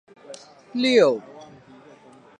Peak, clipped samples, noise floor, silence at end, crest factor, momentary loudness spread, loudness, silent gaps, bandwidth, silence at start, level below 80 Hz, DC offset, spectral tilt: -4 dBFS; under 0.1%; -49 dBFS; 0.95 s; 20 dB; 26 LU; -20 LUFS; none; 10 kHz; 0.3 s; -76 dBFS; under 0.1%; -4.5 dB/octave